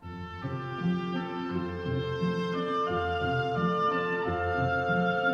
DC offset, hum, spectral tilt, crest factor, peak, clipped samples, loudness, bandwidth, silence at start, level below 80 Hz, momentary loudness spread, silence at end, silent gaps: under 0.1%; none; -7.5 dB/octave; 14 dB; -16 dBFS; under 0.1%; -30 LUFS; 7 kHz; 0 s; -52 dBFS; 6 LU; 0 s; none